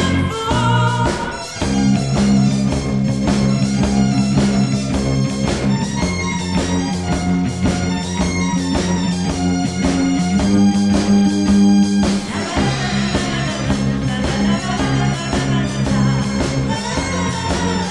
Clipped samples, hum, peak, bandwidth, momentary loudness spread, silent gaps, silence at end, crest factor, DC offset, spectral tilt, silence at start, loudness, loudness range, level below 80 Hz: under 0.1%; none; -4 dBFS; 11.5 kHz; 5 LU; none; 0 s; 14 dB; 0.4%; -5.5 dB/octave; 0 s; -17 LUFS; 3 LU; -32 dBFS